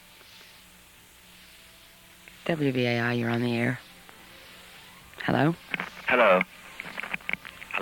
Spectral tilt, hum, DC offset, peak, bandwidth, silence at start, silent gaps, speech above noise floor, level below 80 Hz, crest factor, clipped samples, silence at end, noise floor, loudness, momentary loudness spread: -6 dB/octave; none; under 0.1%; -8 dBFS; 18 kHz; 0.35 s; none; 29 dB; -64 dBFS; 22 dB; under 0.1%; 0 s; -53 dBFS; -27 LUFS; 26 LU